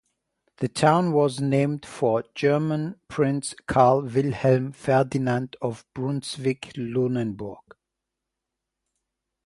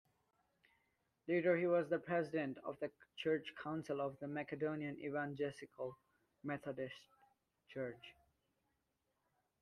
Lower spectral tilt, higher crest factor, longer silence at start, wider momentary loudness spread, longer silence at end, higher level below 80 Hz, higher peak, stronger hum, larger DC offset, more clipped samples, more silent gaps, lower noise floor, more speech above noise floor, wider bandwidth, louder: about the same, -6.5 dB/octave vs -7 dB/octave; about the same, 20 dB vs 20 dB; second, 0.6 s vs 1.25 s; about the same, 12 LU vs 13 LU; first, 1.9 s vs 1.5 s; first, -58 dBFS vs -82 dBFS; first, -4 dBFS vs -24 dBFS; neither; neither; neither; neither; about the same, -84 dBFS vs -86 dBFS; first, 61 dB vs 44 dB; about the same, 11.5 kHz vs 11.5 kHz; first, -24 LUFS vs -42 LUFS